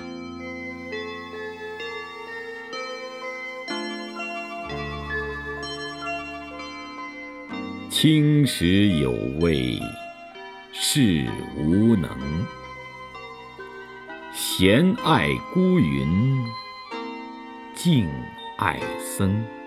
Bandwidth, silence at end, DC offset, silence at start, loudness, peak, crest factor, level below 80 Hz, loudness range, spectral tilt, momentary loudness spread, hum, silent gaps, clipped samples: 16 kHz; 0 s; under 0.1%; 0 s; -24 LUFS; -2 dBFS; 22 dB; -46 dBFS; 10 LU; -5.5 dB/octave; 19 LU; none; none; under 0.1%